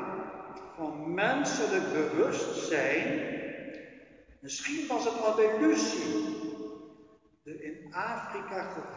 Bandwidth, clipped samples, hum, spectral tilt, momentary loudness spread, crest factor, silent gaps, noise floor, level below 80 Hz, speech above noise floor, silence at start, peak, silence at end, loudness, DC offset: 7.6 kHz; under 0.1%; none; -4 dB/octave; 18 LU; 18 dB; none; -59 dBFS; -70 dBFS; 29 dB; 0 s; -14 dBFS; 0 s; -31 LUFS; under 0.1%